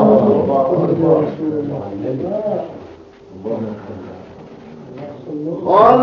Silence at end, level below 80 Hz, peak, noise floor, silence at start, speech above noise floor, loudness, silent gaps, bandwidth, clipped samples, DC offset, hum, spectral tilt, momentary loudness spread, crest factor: 0 s; -54 dBFS; 0 dBFS; -38 dBFS; 0 s; 21 dB; -17 LUFS; none; 6.6 kHz; under 0.1%; under 0.1%; none; -9.5 dB/octave; 24 LU; 16 dB